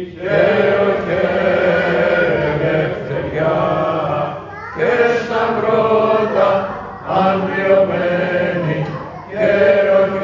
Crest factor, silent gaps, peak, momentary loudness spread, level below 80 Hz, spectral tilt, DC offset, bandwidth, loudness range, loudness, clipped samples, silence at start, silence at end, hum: 14 dB; none; 0 dBFS; 8 LU; -44 dBFS; -7.5 dB/octave; under 0.1%; 7.4 kHz; 2 LU; -16 LUFS; under 0.1%; 0 s; 0 s; none